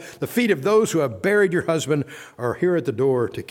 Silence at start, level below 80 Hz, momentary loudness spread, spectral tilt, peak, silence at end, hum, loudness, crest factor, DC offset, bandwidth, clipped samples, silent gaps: 0 s; -62 dBFS; 7 LU; -5.5 dB/octave; -8 dBFS; 0.05 s; none; -21 LUFS; 14 dB; under 0.1%; 17.5 kHz; under 0.1%; none